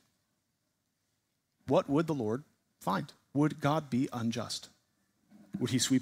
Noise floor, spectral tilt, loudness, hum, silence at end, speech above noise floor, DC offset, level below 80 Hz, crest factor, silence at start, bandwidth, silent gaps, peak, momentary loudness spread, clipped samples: -80 dBFS; -5 dB/octave; -33 LUFS; none; 0 s; 49 dB; under 0.1%; -72 dBFS; 20 dB; 1.65 s; 16 kHz; none; -14 dBFS; 11 LU; under 0.1%